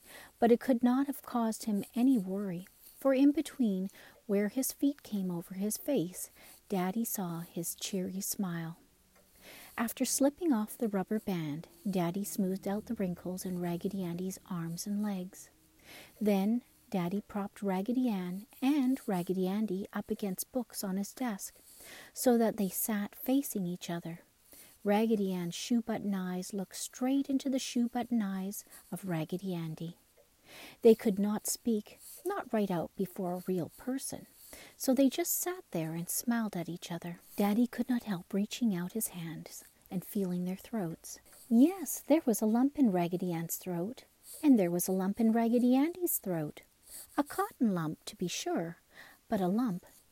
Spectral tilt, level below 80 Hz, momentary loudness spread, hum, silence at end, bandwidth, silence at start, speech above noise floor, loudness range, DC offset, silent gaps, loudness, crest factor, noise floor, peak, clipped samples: -5.5 dB/octave; -70 dBFS; 15 LU; none; 0.35 s; 16 kHz; 0.1 s; 33 dB; 6 LU; under 0.1%; none; -33 LUFS; 20 dB; -65 dBFS; -12 dBFS; under 0.1%